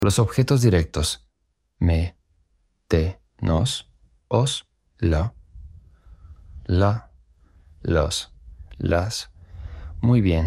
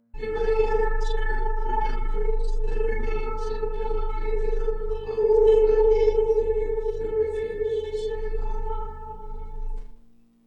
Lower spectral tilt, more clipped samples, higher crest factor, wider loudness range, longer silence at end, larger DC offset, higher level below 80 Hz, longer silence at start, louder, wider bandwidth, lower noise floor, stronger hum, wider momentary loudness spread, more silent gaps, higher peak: about the same, -6 dB/octave vs -7 dB/octave; neither; first, 20 dB vs 14 dB; second, 3 LU vs 8 LU; second, 0 s vs 0.5 s; neither; second, -34 dBFS vs -26 dBFS; second, 0 s vs 0.15 s; about the same, -23 LUFS vs -25 LUFS; first, 14.5 kHz vs 6 kHz; first, -72 dBFS vs -53 dBFS; neither; about the same, 15 LU vs 17 LU; neither; first, -4 dBFS vs -8 dBFS